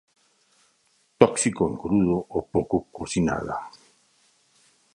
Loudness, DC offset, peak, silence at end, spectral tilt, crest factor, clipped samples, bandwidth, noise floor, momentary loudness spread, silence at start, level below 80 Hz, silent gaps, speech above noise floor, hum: -24 LUFS; under 0.1%; 0 dBFS; 1.25 s; -5.5 dB/octave; 26 dB; under 0.1%; 11.5 kHz; -66 dBFS; 11 LU; 1.2 s; -50 dBFS; none; 42 dB; none